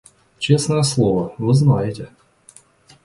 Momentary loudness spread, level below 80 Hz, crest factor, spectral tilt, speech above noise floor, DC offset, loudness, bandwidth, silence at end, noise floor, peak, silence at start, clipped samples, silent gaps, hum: 12 LU; -50 dBFS; 18 dB; -6 dB/octave; 33 dB; under 0.1%; -18 LUFS; 11.5 kHz; 1 s; -50 dBFS; -2 dBFS; 0.4 s; under 0.1%; none; none